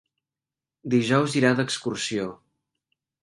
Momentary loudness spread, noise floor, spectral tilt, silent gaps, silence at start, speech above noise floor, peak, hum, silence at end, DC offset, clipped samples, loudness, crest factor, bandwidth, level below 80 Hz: 11 LU; -90 dBFS; -5 dB/octave; none; 0.85 s; 66 dB; -4 dBFS; none; 0.9 s; under 0.1%; under 0.1%; -24 LUFS; 22 dB; 11.5 kHz; -66 dBFS